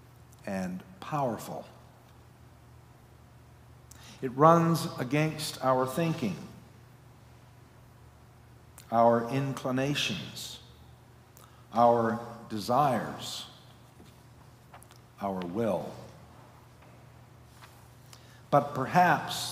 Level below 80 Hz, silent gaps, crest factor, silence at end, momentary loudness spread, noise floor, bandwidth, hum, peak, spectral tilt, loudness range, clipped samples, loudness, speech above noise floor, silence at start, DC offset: -64 dBFS; none; 24 dB; 0 s; 18 LU; -55 dBFS; 16 kHz; none; -6 dBFS; -5.5 dB/octave; 11 LU; under 0.1%; -29 LUFS; 27 dB; 0.3 s; under 0.1%